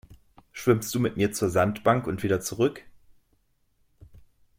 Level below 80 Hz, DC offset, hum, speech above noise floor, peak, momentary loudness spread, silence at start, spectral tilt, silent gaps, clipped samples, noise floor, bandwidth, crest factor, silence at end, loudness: -56 dBFS; under 0.1%; none; 43 dB; -8 dBFS; 4 LU; 0.1 s; -5.5 dB/octave; none; under 0.1%; -68 dBFS; 16.5 kHz; 20 dB; 1.7 s; -25 LUFS